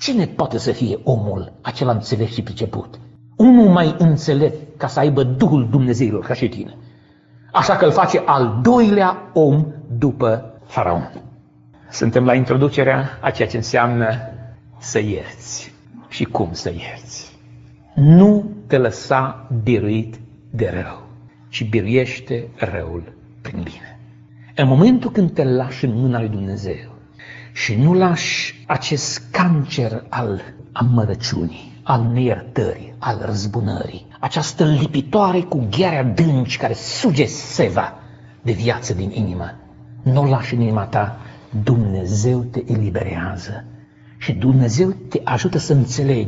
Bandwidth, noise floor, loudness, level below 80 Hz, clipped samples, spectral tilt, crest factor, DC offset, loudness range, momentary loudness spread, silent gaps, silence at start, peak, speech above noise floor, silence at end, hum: 8 kHz; -48 dBFS; -18 LUFS; -46 dBFS; under 0.1%; -6.5 dB/octave; 18 dB; under 0.1%; 6 LU; 16 LU; none; 0 s; 0 dBFS; 31 dB; 0 s; none